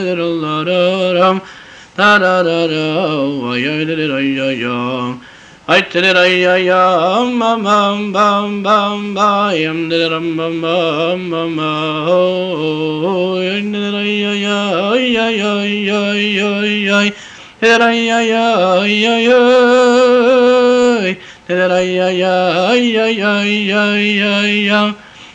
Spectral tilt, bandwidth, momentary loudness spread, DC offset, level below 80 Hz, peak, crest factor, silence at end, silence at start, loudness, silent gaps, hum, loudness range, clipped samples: -5 dB/octave; 9.2 kHz; 8 LU; under 0.1%; -56 dBFS; -2 dBFS; 12 dB; 0.05 s; 0 s; -13 LUFS; none; none; 5 LU; under 0.1%